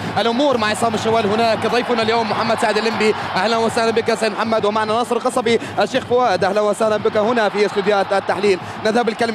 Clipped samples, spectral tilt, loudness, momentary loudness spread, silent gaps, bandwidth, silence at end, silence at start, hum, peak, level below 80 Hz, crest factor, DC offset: under 0.1%; -4.5 dB/octave; -17 LUFS; 2 LU; none; 14 kHz; 0 s; 0 s; none; -4 dBFS; -56 dBFS; 14 dB; under 0.1%